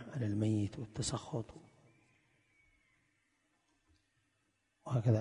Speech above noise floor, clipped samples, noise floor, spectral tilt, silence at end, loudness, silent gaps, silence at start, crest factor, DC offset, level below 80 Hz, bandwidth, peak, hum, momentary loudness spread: 42 dB; under 0.1%; -80 dBFS; -6.5 dB/octave; 0 s; -38 LUFS; none; 0 s; 22 dB; under 0.1%; -64 dBFS; 10.5 kHz; -18 dBFS; none; 11 LU